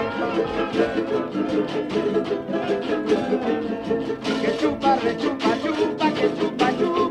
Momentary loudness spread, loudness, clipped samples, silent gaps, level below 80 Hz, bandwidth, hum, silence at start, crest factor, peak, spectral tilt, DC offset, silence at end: 4 LU; -23 LUFS; under 0.1%; none; -52 dBFS; 11 kHz; none; 0 s; 16 dB; -6 dBFS; -6 dB/octave; under 0.1%; 0 s